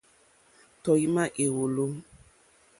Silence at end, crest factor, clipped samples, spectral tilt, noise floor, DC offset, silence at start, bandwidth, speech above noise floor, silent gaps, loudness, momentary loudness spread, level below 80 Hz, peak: 0.8 s; 18 dB; under 0.1%; -5.5 dB/octave; -62 dBFS; under 0.1%; 0.85 s; 11.5 kHz; 36 dB; none; -27 LUFS; 10 LU; -66 dBFS; -12 dBFS